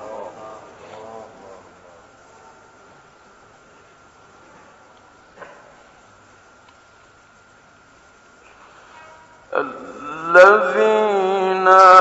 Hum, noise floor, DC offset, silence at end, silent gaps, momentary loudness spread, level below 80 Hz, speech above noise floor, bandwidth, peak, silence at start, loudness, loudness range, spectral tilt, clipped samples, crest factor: none; -50 dBFS; under 0.1%; 0 s; none; 29 LU; -64 dBFS; 36 dB; 8.2 kHz; 0 dBFS; 0 s; -14 LUFS; 27 LU; -4 dB/octave; under 0.1%; 20 dB